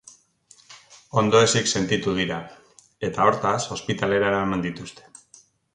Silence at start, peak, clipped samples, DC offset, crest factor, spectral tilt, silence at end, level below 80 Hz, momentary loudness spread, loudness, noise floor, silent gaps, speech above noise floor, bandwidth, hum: 0.7 s; -4 dBFS; under 0.1%; under 0.1%; 20 dB; -4 dB/octave; 0.75 s; -54 dBFS; 14 LU; -22 LUFS; -56 dBFS; none; 34 dB; 11 kHz; none